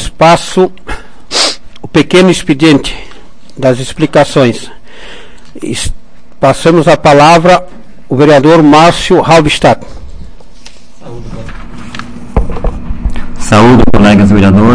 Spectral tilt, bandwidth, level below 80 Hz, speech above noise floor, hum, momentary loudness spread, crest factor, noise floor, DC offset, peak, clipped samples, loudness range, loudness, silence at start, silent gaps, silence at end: -5.5 dB/octave; 11 kHz; -22 dBFS; 30 dB; none; 21 LU; 8 dB; -36 dBFS; 7%; 0 dBFS; 5%; 10 LU; -7 LUFS; 0 s; none; 0 s